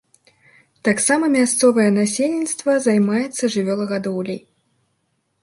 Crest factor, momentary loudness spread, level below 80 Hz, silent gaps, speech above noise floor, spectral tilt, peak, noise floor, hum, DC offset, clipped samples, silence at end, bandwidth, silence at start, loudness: 16 dB; 9 LU; -66 dBFS; none; 51 dB; -4.5 dB/octave; -4 dBFS; -69 dBFS; none; under 0.1%; under 0.1%; 1.05 s; 11.5 kHz; 0.85 s; -18 LUFS